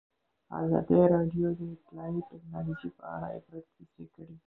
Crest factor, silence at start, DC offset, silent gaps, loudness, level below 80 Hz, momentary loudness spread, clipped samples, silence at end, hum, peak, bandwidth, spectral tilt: 20 dB; 0.5 s; under 0.1%; none; -30 LUFS; -60 dBFS; 25 LU; under 0.1%; 0.15 s; none; -12 dBFS; 3.9 kHz; -12.5 dB/octave